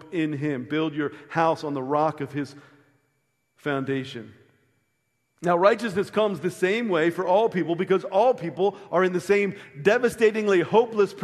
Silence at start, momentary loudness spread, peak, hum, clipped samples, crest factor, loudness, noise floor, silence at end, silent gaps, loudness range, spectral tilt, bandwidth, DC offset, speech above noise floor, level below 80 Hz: 0 s; 10 LU; -4 dBFS; none; under 0.1%; 20 dB; -24 LUFS; -74 dBFS; 0 s; none; 8 LU; -6 dB/octave; 13 kHz; under 0.1%; 50 dB; -68 dBFS